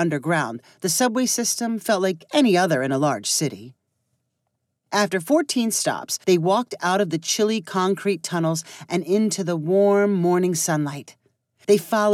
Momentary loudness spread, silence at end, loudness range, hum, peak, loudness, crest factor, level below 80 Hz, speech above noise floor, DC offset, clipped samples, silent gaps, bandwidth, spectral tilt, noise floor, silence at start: 7 LU; 0 s; 2 LU; none; -6 dBFS; -21 LUFS; 16 dB; -84 dBFS; 55 dB; under 0.1%; under 0.1%; none; 16.5 kHz; -4 dB/octave; -76 dBFS; 0 s